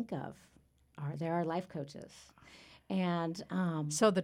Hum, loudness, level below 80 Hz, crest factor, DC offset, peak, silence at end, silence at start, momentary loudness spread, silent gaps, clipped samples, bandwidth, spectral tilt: none; -36 LUFS; -72 dBFS; 20 dB; under 0.1%; -16 dBFS; 0 s; 0 s; 23 LU; none; under 0.1%; 15.5 kHz; -5.5 dB/octave